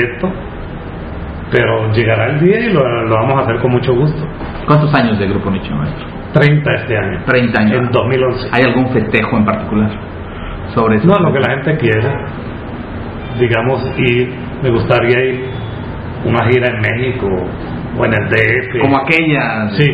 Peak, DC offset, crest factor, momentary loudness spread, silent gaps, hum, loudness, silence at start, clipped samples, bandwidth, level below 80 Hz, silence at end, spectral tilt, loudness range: 0 dBFS; under 0.1%; 14 dB; 14 LU; none; none; -13 LUFS; 0 s; under 0.1%; 5.2 kHz; -32 dBFS; 0 s; -9 dB/octave; 2 LU